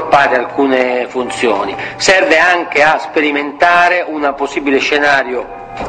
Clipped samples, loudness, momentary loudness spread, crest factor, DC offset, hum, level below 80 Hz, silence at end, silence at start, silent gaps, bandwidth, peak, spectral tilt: 0.1%; -12 LUFS; 8 LU; 12 dB; under 0.1%; none; -46 dBFS; 0 s; 0 s; none; 10 kHz; 0 dBFS; -3 dB/octave